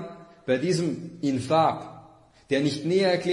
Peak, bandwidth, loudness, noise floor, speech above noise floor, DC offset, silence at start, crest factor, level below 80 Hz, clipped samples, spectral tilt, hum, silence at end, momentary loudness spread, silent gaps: -10 dBFS; 11 kHz; -25 LUFS; -53 dBFS; 29 dB; under 0.1%; 0 s; 16 dB; -64 dBFS; under 0.1%; -6 dB/octave; none; 0 s; 15 LU; none